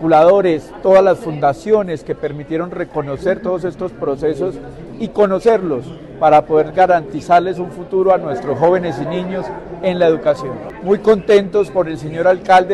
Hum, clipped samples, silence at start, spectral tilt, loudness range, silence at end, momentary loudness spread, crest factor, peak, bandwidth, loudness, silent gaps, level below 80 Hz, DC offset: none; under 0.1%; 0 s; -7 dB/octave; 5 LU; 0 s; 12 LU; 14 dB; -2 dBFS; 11.5 kHz; -15 LUFS; none; -44 dBFS; under 0.1%